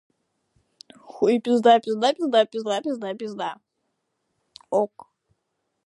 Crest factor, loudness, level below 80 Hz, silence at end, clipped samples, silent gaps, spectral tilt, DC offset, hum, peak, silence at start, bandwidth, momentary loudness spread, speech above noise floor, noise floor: 20 dB; -23 LUFS; -76 dBFS; 1 s; under 0.1%; none; -4.5 dB/octave; under 0.1%; none; -4 dBFS; 1.1 s; 11.5 kHz; 13 LU; 55 dB; -77 dBFS